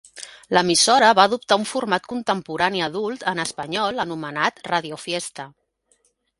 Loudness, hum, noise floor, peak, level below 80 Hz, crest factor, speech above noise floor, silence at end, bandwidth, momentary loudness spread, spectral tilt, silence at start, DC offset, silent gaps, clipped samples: -20 LUFS; none; -65 dBFS; 0 dBFS; -62 dBFS; 22 dB; 44 dB; 0.9 s; 11.5 kHz; 13 LU; -2.5 dB/octave; 0.15 s; under 0.1%; none; under 0.1%